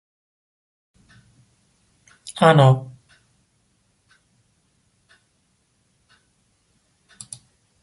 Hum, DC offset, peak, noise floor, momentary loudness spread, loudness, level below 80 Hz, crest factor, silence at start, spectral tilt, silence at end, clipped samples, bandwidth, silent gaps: none; under 0.1%; -2 dBFS; -67 dBFS; 29 LU; -16 LUFS; -64 dBFS; 24 dB; 2.25 s; -6.5 dB/octave; 4.95 s; under 0.1%; 11.5 kHz; none